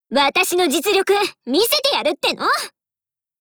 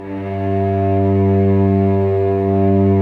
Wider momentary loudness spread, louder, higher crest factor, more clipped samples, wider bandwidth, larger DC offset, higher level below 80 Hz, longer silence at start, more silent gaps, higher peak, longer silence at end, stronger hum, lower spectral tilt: about the same, 4 LU vs 5 LU; about the same, -17 LUFS vs -16 LUFS; first, 16 dB vs 10 dB; neither; first, over 20 kHz vs 4 kHz; neither; second, -60 dBFS vs -54 dBFS; about the same, 0.1 s vs 0 s; neither; about the same, -4 dBFS vs -6 dBFS; first, 0.7 s vs 0 s; neither; second, -1 dB/octave vs -11.5 dB/octave